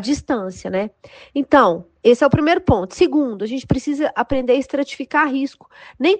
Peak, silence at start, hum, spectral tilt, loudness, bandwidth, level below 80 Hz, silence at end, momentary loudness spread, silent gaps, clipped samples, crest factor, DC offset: -2 dBFS; 0 s; none; -6 dB/octave; -18 LUFS; 9.2 kHz; -42 dBFS; 0 s; 10 LU; none; under 0.1%; 16 dB; under 0.1%